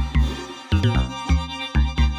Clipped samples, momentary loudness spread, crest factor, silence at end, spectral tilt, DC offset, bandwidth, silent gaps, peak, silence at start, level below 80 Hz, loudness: under 0.1%; 5 LU; 12 dB; 0 s; -6 dB/octave; under 0.1%; 10 kHz; none; -8 dBFS; 0 s; -24 dBFS; -23 LUFS